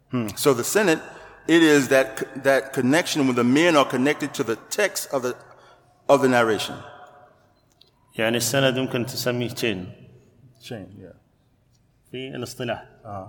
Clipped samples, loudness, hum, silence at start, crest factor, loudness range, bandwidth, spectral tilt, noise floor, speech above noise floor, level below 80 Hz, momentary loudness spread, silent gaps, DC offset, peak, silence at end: under 0.1%; -21 LUFS; none; 0.1 s; 20 dB; 12 LU; 19 kHz; -4 dB/octave; -62 dBFS; 40 dB; -64 dBFS; 20 LU; none; under 0.1%; -4 dBFS; 0 s